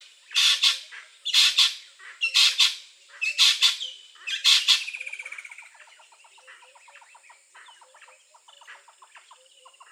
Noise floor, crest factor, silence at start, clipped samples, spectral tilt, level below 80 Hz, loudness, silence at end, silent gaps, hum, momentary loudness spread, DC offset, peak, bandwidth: -55 dBFS; 22 dB; 0.3 s; under 0.1%; 10 dB/octave; under -90 dBFS; -20 LUFS; 0.75 s; none; none; 21 LU; under 0.1%; -6 dBFS; 17 kHz